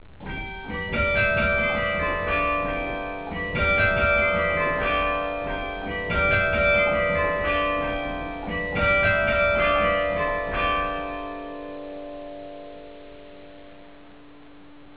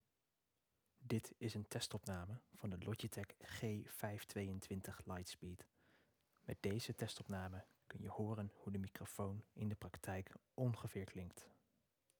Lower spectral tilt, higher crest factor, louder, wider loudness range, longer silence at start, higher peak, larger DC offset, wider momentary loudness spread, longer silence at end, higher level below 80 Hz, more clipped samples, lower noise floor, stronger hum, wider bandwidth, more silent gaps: first, -8.5 dB/octave vs -5.5 dB/octave; about the same, 16 dB vs 20 dB; first, -23 LUFS vs -48 LUFS; first, 11 LU vs 2 LU; second, 0 s vs 1 s; first, -8 dBFS vs -30 dBFS; first, 0.4% vs under 0.1%; first, 17 LU vs 11 LU; second, 0 s vs 0.65 s; first, -38 dBFS vs -76 dBFS; neither; second, -48 dBFS vs -89 dBFS; neither; second, 4 kHz vs over 20 kHz; neither